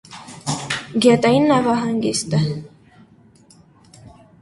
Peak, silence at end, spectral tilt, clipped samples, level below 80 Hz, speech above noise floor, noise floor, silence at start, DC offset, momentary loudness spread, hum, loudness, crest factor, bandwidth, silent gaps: -2 dBFS; 1.75 s; -5 dB/octave; under 0.1%; -54 dBFS; 34 dB; -50 dBFS; 0.1 s; under 0.1%; 14 LU; none; -18 LUFS; 18 dB; 11.5 kHz; none